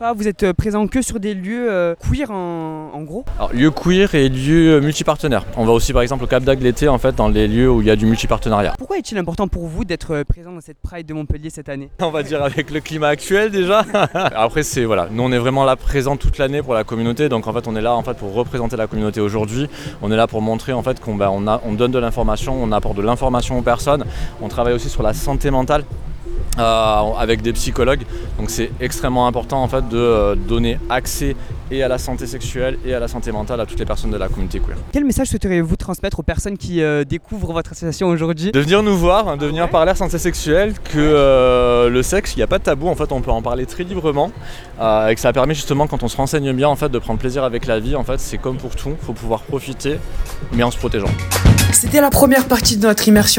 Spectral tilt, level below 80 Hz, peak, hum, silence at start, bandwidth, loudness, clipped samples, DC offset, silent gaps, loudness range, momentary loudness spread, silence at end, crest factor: -5 dB/octave; -26 dBFS; 0 dBFS; none; 0 s; 17.5 kHz; -17 LUFS; under 0.1%; under 0.1%; none; 7 LU; 12 LU; 0 s; 16 dB